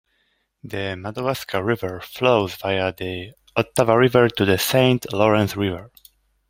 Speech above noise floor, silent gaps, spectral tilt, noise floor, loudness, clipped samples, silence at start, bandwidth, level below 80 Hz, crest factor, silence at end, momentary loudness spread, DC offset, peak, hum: 48 dB; none; -5.5 dB/octave; -68 dBFS; -20 LUFS; under 0.1%; 0.65 s; 16.5 kHz; -54 dBFS; 20 dB; 0.6 s; 13 LU; under 0.1%; -2 dBFS; none